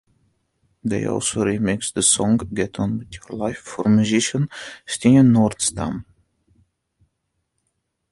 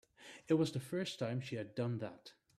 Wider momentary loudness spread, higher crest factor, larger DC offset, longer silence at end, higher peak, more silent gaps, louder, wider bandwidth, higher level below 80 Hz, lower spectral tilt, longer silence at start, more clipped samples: second, 14 LU vs 20 LU; about the same, 18 dB vs 18 dB; neither; first, 2.1 s vs 0.25 s; first, -2 dBFS vs -22 dBFS; neither; first, -20 LUFS vs -39 LUFS; second, 11.5 kHz vs 14 kHz; first, -48 dBFS vs -78 dBFS; second, -4.5 dB/octave vs -6.5 dB/octave; first, 0.85 s vs 0.2 s; neither